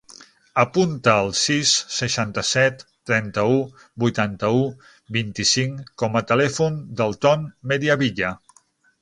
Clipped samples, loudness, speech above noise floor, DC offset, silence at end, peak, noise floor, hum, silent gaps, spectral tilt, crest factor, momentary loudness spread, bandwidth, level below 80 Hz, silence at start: under 0.1%; -21 LUFS; 38 dB; under 0.1%; 0.65 s; 0 dBFS; -59 dBFS; none; none; -4 dB/octave; 22 dB; 8 LU; 11 kHz; -54 dBFS; 0.1 s